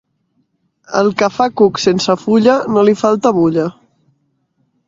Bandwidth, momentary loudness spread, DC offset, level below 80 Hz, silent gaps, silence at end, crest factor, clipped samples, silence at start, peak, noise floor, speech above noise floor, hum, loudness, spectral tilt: 7.8 kHz; 4 LU; under 0.1%; -54 dBFS; none; 1.15 s; 14 dB; under 0.1%; 0.9 s; 0 dBFS; -63 dBFS; 51 dB; none; -13 LUFS; -5.5 dB/octave